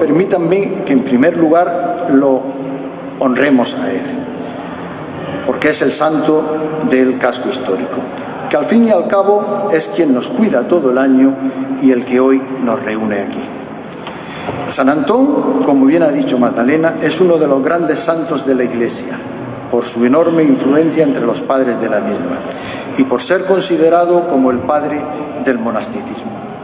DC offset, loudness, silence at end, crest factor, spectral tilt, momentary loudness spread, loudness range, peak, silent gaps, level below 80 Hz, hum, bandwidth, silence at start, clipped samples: under 0.1%; -13 LUFS; 0 s; 14 dB; -10.5 dB/octave; 13 LU; 4 LU; 0 dBFS; none; -52 dBFS; none; 4 kHz; 0 s; under 0.1%